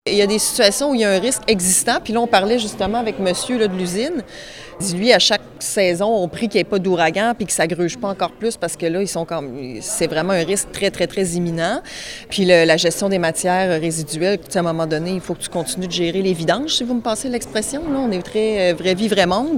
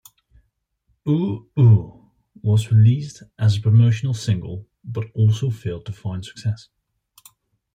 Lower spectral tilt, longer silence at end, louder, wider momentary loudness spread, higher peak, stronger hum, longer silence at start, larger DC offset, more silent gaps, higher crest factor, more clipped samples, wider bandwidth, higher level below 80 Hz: second, -3.5 dB/octave vs -7.5 dB/octave; second, 0 s vs 1.2 s; about the same, -18 LUFS vs -20 LUFS; second, 9 LU vs 16 LU; first, 0 dBFS vs -4 dBFS; neither; second, 0.05 s vs 1.05 s; neither; neither; about the same, 18 dB vs 16 dB; neither; first, 17.5 kHz vs 9 kHz; first, -46 dBFS vs -54 dBFS